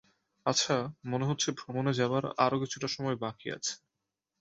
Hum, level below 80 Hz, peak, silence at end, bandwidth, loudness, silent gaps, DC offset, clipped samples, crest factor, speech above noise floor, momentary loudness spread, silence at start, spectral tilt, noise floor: none; -70 dBFS; -10 dBFS; 0.65 s; 8.2 kHz; -32 LUFS; none; under 0.1%; under 0.1%; 22 dB; 55 dB; 7 LU; 0.45 s; -4 dB/octave; -87 dBFS